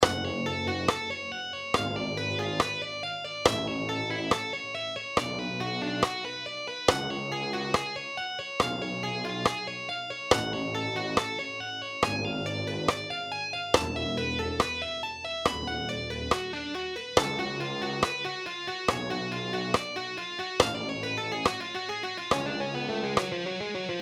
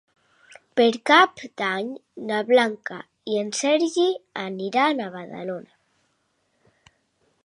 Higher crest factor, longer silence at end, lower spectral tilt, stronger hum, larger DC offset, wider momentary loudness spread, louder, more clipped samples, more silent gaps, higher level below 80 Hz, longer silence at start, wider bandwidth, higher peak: about the same, 26 dB vs 22 dB; second, 0 s vs 1.85 s; about the same, -4 dB/octave vs -3.5 dB/octave; neither; neither; second, 7 LU vs 17 LU; second, -30 LUFS vs -22 LUFS; neither; neither; first, -52 dBFS vs -76 dBFS; second, 0 s vs 0.75 s; first, 18.5 kHz vs 11.5 kHz; about the same, -4 dBFS vs -2 dBFS